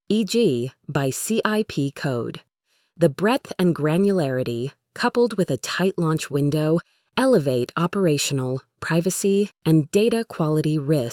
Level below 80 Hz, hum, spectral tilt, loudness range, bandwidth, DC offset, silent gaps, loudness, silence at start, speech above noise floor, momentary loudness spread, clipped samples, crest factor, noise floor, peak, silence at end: -60 dBFS; none; -5.5 dB/octave; 2 LU; 17.5 kHz; under 0.1%; none; -22 LUFS; 0.1 s; 48 dB; 7 LU; under 0.1%; 18 dB; -69 dBFS; -4 dBFS; 0 s